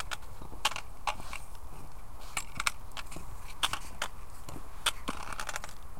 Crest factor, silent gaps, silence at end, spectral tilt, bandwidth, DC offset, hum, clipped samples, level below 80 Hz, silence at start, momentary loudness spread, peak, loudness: 30 dB; none; 0 s; -1.5 dB/octave; 17 kHz; 2%; none; under 0.1%; -46 dBFS; 0 s; 16 LU; -8 dBFS; -37 LUFS